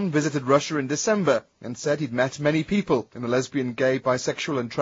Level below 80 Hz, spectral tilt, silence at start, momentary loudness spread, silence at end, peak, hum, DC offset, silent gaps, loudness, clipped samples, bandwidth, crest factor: -60 dBFS; -5 dB/octave; 0 s; 5 LU; 0 s; -6 dBFS; none; under 0.1%; none; -24 LUFS; under 0.1%; 7.8 kHz; 18 dB